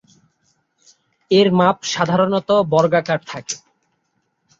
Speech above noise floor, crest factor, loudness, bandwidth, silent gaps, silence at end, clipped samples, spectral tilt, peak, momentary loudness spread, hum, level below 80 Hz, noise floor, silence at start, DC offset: 53 dB; 18 dB; -17 LUFS; 7.8 kHz; none; 1 s; under 0.1%; -5 dB/octave; -2 dBFS; 13 LU; none; -60 dBFS; -69 dBFS; 1.3 s; under 0.1%